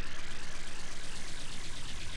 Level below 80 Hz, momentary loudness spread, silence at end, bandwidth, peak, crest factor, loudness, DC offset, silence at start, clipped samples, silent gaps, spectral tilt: -40 dBFS; 1 LU; 0 s; 11 kHz; -24 dBFS; 6 dB; -43 LUFS; under 0.1%; 0 s; under 0.1%; none; -2.5 dB/octave